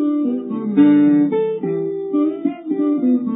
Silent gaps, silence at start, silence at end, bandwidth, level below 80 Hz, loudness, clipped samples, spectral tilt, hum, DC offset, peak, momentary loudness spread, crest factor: none; 0 s; 0 s; 3.9 kHz; -72 dBFS; -17 LUFS; under 0.1%; -13 dB/octave; none; under 0.1%; -2 dBFS; 10 LU; 14 dB